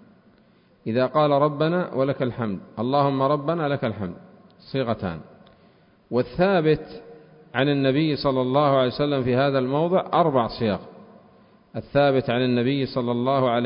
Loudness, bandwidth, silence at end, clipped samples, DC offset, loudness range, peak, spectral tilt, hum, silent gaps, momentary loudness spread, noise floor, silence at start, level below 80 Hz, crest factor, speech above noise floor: -23 LUFS; 5.4 kHz; 0 s; under 0.1%; under 0.1%; 5 LU; -6 dBFS; -11.5 dB/octave; none; none; 10 LU; -57 dBFS; 0.85 s; -54 dBFS; 18 dB; 35 dB